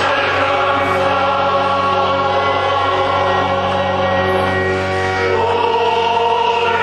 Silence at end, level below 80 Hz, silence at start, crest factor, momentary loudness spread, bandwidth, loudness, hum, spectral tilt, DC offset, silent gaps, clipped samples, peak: 0 s; -48 dBFS; 0 s; 12 dB; 2 LU; 12 kHz; -15 LUFS; none; -5 dB/octave; under 0.1%; none; under 0.1%; -2 dBFS